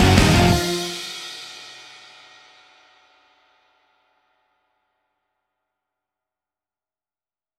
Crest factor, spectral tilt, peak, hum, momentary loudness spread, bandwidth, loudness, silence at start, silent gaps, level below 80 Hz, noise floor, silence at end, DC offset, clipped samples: 24 dB; -4.5 dB/octave; -2 dBFS; none; 28 LU; 16.5 kHz; -19 LUFS; 0 s; none; -36 dBFS; under -90 dBFS; 5.9 s; under 0.1%; under 0.1%